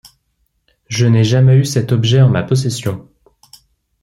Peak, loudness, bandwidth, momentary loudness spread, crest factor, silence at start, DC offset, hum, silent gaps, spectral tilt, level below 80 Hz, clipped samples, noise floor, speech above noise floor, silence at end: -2 dBFS; -13 LUFS; 12.5 kHz; 12 LU; 12 dB; 0.9 s; under 0.1%; none; none; -6.5 dB/octave; -50 dBFS; under 0.1%; -65 dBFS; 53 dB; 1 s